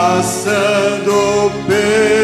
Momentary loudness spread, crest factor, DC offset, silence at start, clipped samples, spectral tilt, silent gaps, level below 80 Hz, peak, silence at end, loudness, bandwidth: 3 LU; 12 dB; under 0.1%; 0 s; under 0.1%; -4 dB/octave; none; -46 dBFS; -2 dBFS; 0 s; -14 LUFS; 14.5 kHz